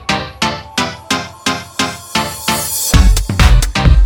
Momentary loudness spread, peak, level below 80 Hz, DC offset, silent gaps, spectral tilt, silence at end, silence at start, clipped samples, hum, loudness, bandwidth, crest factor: 7 LU; 0 dBFS; -16 dBFS; under 0.1%; none; -3.5 dB/octave; 0 s; 0 s; under 0.1%; none; -15 LUFS; over 20 kHz; 12 dB